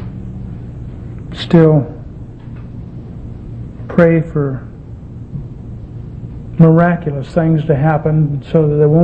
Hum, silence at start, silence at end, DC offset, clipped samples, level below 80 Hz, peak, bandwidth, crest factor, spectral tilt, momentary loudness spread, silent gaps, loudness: none; 0 s; 0 s; under 0.1%; under 0.1%; -34 dBFS; 0 dBFS; 5.4 kHz; 14 dB; -10 dB/octave; 21 LU; none; -13 LUFS